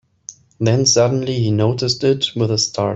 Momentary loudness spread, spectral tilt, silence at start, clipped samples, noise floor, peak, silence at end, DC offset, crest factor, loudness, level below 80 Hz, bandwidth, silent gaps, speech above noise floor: 16 LU; -4.5 dB/octave; 0.3 s; under 0.1%; -41 dBFS; -2 dBFS; 0 s; under 0.1%; 14 dB; -16 LUFS; -52 dBFS; 8 kHz; none; 24 dB